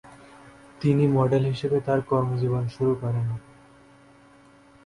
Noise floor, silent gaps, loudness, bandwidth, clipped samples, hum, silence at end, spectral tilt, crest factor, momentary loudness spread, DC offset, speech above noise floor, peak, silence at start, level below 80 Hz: -54 dBFS; none; -24 LUFS; 11 kHz; under 0.1%; none; 1.45 s; -9 dB/octave; 18 dB; 7 LU; under 0.1%; 31 dB; -8 dBFS; 0.05 s; -56 dBFS